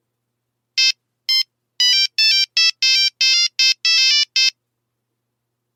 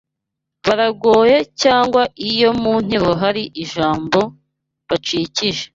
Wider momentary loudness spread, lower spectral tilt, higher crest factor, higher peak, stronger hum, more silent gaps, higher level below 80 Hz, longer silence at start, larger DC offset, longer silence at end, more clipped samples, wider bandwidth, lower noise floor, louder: second, 5 LU vs 9 LU; second, 8 dB/octave vs -4.5 dB/octave; about the same, 16 dB vs 16 dB; about the same, -2 dBFS vs 0 dBFS; neither; neither; second, under -90 dBFS vs -48 dBFS; about the same, 0.75 s vs 0.65 s; neither; first, 1.25 s vs 0.1 s; neither; first, 17 kHz vs 7.8 kHz; second, -76 dBFS vs -80 dBFS; about the same, -14 LUFS vs -16 LUFS